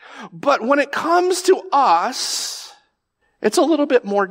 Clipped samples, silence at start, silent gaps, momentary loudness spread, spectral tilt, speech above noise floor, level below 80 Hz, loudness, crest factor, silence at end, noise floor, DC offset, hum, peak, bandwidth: under 0.1%; 0.1 s; none; 8 LU; -3 dB/octave; 51 dB; -76 dBFS; -18 LUFS; 16 dB; 0 s; -68 dBFS; under 0.1%; none; -4 dBFS; 16 kHz